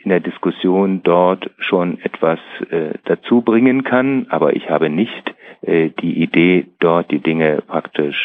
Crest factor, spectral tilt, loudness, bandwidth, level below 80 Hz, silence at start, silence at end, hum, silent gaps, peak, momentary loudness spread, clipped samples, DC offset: 16 dB; -9.5 dB/octave; -16 LUFS; 4 kHz; -62 dBFS; 0.05 s; 0 s; none; none; 0 dBFS; 8 LU; under 0.1%; under 0.1%